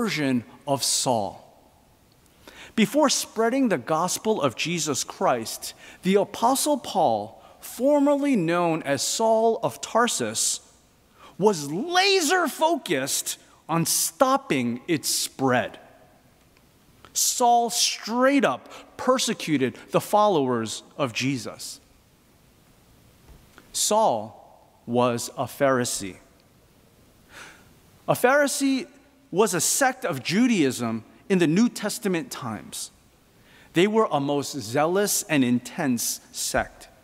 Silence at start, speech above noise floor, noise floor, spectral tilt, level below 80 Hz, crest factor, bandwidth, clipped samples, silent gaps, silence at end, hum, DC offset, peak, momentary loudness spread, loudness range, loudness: 0 s; 34 dB; -58 dBFS; -3.5 dB/octave; -62 dBFS; 22 dB; 16 kHz; under 0.1%; none; 0.2 s; none; under 0.1%; -4 dBFS; 12 LU; 4 LU; -23 LUFS